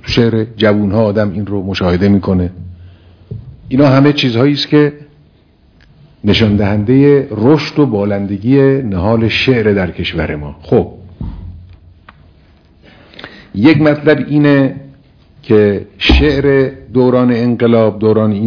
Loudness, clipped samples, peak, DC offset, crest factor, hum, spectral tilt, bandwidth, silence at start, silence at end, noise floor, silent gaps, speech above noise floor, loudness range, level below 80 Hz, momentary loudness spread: -11 LUFS; 0.2%; 0 dBFS; under 0.1%; 12 dB; none; -8 dB/octave; 5.4 kHz; 0.05 s; 0 s; -48 dBFS; none; 37 dB; 6 LU; -28 dBFS; 17 LU